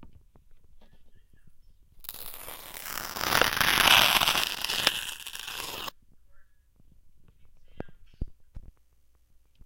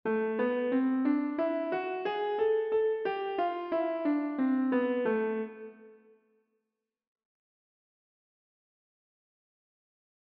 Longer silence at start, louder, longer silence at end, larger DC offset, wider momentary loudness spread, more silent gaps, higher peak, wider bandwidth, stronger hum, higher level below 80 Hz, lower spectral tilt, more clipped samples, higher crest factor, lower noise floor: about the same, 0 s vs 0.05 s; first, -24 LUFS vs -30 LUFS; second, 1 s vs 4.4 s; neither; first, 26 LU vs 5 LU; neither; first, -4 dBFS vs -18 dBFS; first, 17 kHz vs 5.4 kHz; neither; first, -50 dBFS vs -80 dBFS; second, -0.5 dB/octave vs -4 dB/octave; neither; first, 26 dB vs 14 dB; second, -61 dBFS vs -86 dBFS